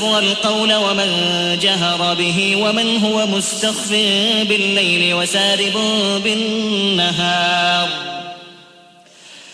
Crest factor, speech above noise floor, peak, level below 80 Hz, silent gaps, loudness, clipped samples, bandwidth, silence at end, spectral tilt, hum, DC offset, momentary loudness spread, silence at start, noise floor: 14 dB; 29 dB; -4 dBFS; -58 dBFS; none; -15 LUFS; under 0.1%; 11 kHz; 0 s; -3 dB/octave; none; under 0.1%; 4 LU; 0 s; -45 dBFS